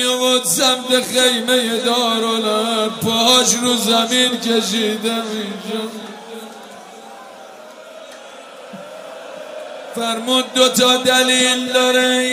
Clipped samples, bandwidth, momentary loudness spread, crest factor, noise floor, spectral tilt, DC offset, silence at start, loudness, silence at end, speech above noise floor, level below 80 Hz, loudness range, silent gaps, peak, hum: under 0.1%; 16 kHz; 24 LU; 18 dB; -37 dBFS; -1.5 dB/octave; under 0.1%; 0 s; -15 LUFS; 0 s; 21 dB; -68 dBFS; 20 LU; none; 0 dBFS; none